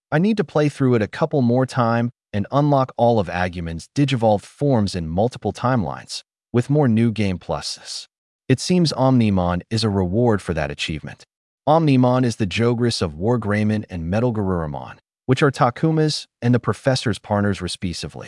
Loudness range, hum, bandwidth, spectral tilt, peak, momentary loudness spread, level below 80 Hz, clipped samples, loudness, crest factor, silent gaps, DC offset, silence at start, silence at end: 2 LU; none; 12 kHz; -6.5 dB/octave; -4 dBFS; 10 LU; -50 dBFS; under 0.1%; -20 LUFS; 16 dB; 8.18-8.39 s, 11.36-11.58 s; under 0.1%; 0.1 s; 0 s